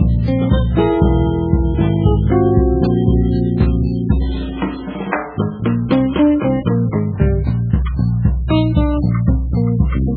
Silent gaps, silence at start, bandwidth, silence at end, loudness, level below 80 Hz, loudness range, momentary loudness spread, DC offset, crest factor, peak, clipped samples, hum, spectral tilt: none; 0 s; 4.8 kHz; 0 s; -16 LUFS; -20 dBFS; 3 LU; 6 LU; under 0.1%; 14 dB; 0 dBFS; under 0.1%; none; -12 dB/octave